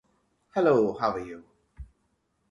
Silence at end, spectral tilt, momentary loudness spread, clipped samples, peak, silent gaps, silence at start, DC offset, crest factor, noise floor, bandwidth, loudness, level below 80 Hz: 0.65 s; -7.5 dB/octave; 19 LU; under 0.1%; -10 dBFS; none; 0.55 s; under 0.1%; 20 dB; -73 dBFS; 7.4 kHz; -26 LUFS; -56 dBFS